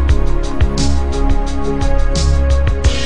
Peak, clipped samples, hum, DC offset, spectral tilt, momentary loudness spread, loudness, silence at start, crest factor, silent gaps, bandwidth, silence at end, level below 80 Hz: 0 dBFS; under 0.1%; none; under 0.1%; -5.5 dB/octave; 4 LU; -17 LUFS; 0 s; 12 dB; none; 10 kHz; 0 s; -14 dBFS